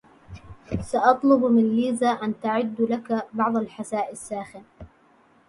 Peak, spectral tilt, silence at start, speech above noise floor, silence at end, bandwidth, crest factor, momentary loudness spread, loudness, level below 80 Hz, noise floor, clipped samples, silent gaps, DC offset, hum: -4 dBFS; -6 dB/octave; 0.3 s; 35 dB; 0.6 s; 11.5 kHz; 22 dB; 15 LU; -23 LUFS; -52 dBFS; -58 dBFS; under 0.1%; none; under 0.1%; none